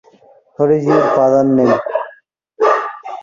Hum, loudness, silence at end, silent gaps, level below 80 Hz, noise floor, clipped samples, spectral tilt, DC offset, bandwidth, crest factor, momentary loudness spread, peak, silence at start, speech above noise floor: none; -14 LUFS; 0 s; none; -58 dBFS; -48 dBFS; under 0.1%; -7.5 dB/octave; under 0.1%; 7.4 kHz; 14 dB; 11 LU; 0 dBFS; 0.6 s; 36 dB